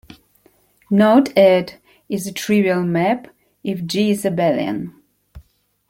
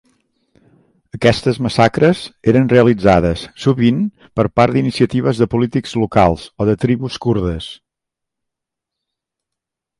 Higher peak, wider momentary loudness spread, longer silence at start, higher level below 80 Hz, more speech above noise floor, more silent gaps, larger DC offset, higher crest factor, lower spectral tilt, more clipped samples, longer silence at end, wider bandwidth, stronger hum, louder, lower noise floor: about the same, -2 dBFS vs 0 dBFS; first, 14 LU vs 8 LU; second, 0.9 s vs 1.15 s; second, -54 dBFS vs -38 dBFS; second, 40 dB vs 68 dB; neither; neither; about the same, 18 dB vs 16 dB; about the same, -6 dB/octave vs -7 dB/octave; neither; second, 0.5 s vs 2.25 s; first, 16.5 kHz vs 11.5 kHz; first, 50 Hz at -45 dBFS vs none; about the same, -17 LUFS vs -15 LUFS; second, -57 dBFS vs -82 dBFS